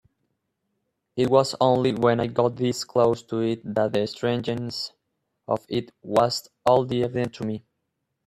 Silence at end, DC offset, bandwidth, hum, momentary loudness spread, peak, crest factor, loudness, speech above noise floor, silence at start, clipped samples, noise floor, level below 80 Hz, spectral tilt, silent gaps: 0.7 s; under 0.1%; 13.5 kHz; none; 10 LU; -4 dBFS; 20 dB; -24 LUFS; 55 dB; 1.15 s; under 0.1%; -78 dBFS; -62 dBFS; -6 dB/octave; none